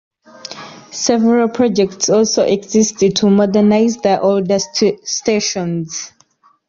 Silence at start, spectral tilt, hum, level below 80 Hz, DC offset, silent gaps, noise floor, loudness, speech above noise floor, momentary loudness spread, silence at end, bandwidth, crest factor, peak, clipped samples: 0.5 s; -4.5 dB/octave; none; -54 dBFS; under 0.1%; none; -53 dBFS; -14 LUFS; 40 dB; 17 LU; 0.6 s; 7.6 kHz; 14 dB; 0 dBFS; under 0.1%